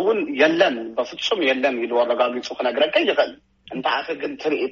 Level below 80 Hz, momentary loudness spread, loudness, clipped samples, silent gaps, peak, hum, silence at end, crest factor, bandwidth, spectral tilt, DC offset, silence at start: -64 dBFS; 8 LU; -21 LUFS; under 0.1%; none; -4 dBFS; none; 0 s; 18 dB; 7.4 kHz; -1 dB/octave; under 0.1%; 0 s